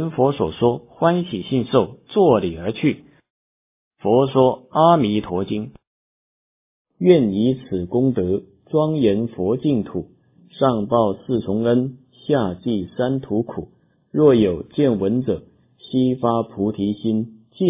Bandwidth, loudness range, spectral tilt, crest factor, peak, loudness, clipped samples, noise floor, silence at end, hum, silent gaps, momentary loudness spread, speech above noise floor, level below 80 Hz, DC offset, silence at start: 3.9 kHz; 2 LU; -12 dB/octave; 18 dB; -2 dBFS; -20 LUFS; under 0.1%; under -90 dBFS; 0 s; none; 3.30-3.91 s, 5.87-6.85 s; 11 LU; over 71 dB; -48 dBFS; under 0.1%; 0 s